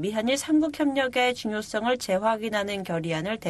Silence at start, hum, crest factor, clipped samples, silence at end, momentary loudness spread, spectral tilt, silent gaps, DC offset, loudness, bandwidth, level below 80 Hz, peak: 0 s; none; 16 dB; under 0.1%; 0 s; 6 LU; -4.5 dB/octave; none; under 0.1%; -26 LUFS; 13 kHz; -60 dBFS; -10 dBFS